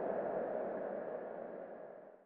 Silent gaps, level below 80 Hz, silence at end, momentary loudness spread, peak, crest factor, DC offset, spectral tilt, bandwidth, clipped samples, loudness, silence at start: none; -80 dBFS; 0 s; 12 LU; -26 dBFS; 16 dB; under 0.1%; -7 dB/octave; 4 kHz; under 0.1%; -42 LUFS; 0 s